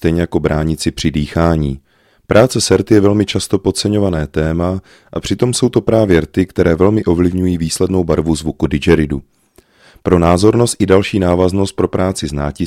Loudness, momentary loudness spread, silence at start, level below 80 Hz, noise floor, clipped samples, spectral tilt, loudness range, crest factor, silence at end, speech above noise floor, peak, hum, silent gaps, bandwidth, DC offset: -14 LUFS; 8 LU; 0 s; -32 dBFS; -49 dBFS; under 0.1%; -6 dB/octave; 1 LU; 14 dB; 0 s; 36 dB; 0 dBFS; none; none; 16 kHz; under 0.1%